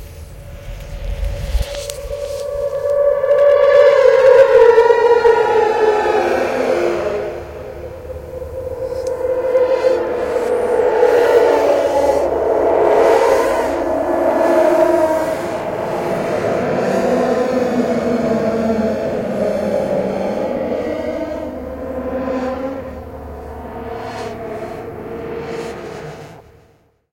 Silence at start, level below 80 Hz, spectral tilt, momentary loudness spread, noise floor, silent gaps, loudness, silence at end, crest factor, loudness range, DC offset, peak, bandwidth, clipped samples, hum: 0 s; -36 dBFS; -6 dB/octave; 18 LU; -54 dBFS; none; -15 LUFS; 0.7 s; 16 dB; 14 LU; under 0.1%; 0 dBFS; 17 kHz; under 0.1%; none